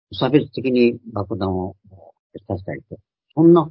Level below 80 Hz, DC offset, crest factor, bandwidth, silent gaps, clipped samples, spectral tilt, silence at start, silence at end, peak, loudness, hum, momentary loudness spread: -46 dBFS; under 0.1%; 18 dB; 5.6 kHz; 2.19-2.30 s; under 0.1%; -12.5 dB/octave; 0.1 s; 0 s; 0 dBFS; -20 LUFS; none; 16 LU